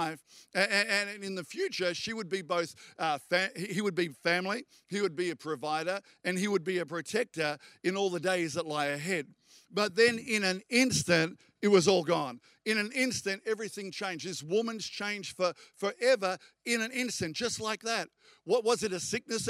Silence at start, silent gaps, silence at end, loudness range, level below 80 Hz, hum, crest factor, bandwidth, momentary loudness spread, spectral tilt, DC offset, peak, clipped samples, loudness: 0 s; none; 0 s; 5 LU; -74 dBFS; none; 22 dB; 15.5 kHz; 10 LU; -3.5 dB/octave; under 0.1%; -10 dBFS; under 0.1%; -31 LUFS